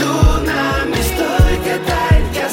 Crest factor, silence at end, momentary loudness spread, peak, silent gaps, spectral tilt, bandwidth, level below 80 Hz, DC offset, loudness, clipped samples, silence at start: 12 dB; 0 s; 3 LU; -2 dBFS; none; -5.5 dB/octave; 17 kHz; -18 dBFS; under 0.1%; -15 LUFS; under 0.1%; 0 s